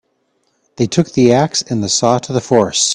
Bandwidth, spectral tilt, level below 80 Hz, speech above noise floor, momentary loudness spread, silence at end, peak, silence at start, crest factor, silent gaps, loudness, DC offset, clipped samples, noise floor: 10.5 kHz; -4 dB/octave; -50 dBFS; 50 dB; 5 LU; 0 s; 0 dBFS; 0.8 s; 14 dB; none; -14 LUFS; under 0.1%; under 0.1%; -63 dBFS